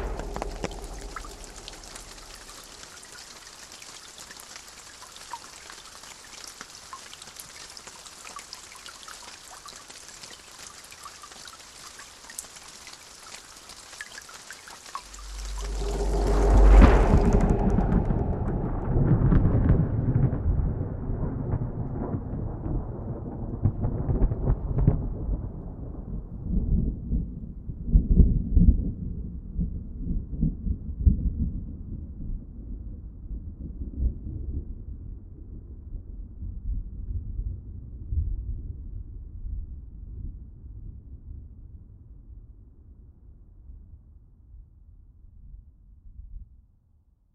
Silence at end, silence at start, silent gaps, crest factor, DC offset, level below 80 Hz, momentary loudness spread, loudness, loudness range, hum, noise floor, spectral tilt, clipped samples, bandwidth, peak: 0.9 s; 0 s; none; 26 dB; under 0.1%; -30 dBFS; 20 LU; -28 LUFS; 19 LU; none; -62 dBFS; -6.5 dB/octave; under 0.1%; 12.5 kHz; -2 dBFS